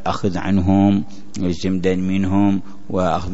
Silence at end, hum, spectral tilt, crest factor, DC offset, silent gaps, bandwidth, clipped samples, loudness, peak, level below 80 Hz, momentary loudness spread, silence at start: 0 s; none; -7.5 dB/octave; 16 dB; 5%; none; 8 kHz; under 0.1%; -19 LUFS; -4 dBFS; -44 dBFS; 10 LU; 0.05 s